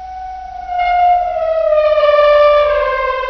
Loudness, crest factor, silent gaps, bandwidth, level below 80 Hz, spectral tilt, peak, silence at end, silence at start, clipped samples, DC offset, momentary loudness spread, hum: -12 LUFS; 12 dB; none; 6.2 kHz; -38 dBFS; 1 dB/octave; 0 dBFS; 0 s; 0 s; under 0.1%; under 0.1%; 18 LU; none